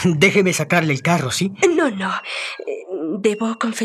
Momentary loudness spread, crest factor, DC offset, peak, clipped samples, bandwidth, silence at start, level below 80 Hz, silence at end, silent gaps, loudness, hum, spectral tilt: 12 LU; 18 dB; under 0.1%; -2 dBFS; under 0.1%; 14 kHz; 0 s; -60 dBFS; 0 s; none; -19 LUFS; none; -4.5 dB/octave